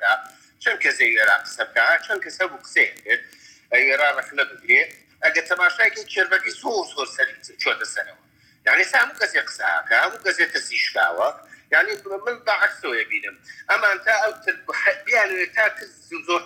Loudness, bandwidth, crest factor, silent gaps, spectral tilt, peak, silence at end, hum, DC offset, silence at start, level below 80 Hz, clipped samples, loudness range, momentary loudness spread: -20 LUFS; 17 kHz; 16 dB; none; -0.5 dB/octave; -4 dBFS; 0 s; none; under 0.1%; 0 s; -76 dBFS; under 0.1%; 3 LU; 9 LU